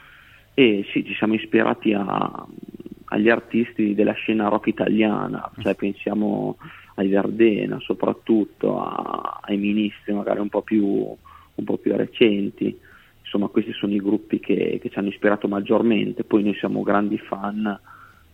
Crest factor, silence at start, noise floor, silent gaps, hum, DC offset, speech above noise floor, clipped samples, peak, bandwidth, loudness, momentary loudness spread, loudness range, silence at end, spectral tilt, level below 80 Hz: 20 dB; 0.55 s; -49 dBFS; none; none; under 0.1%; 28 dB; under 0.1%; -2 dBFS; 4.2 kHz; -22 LUFS; 10 LU; 2 LU; 0.3 s; -8.5 dB/octave; -58 dBFS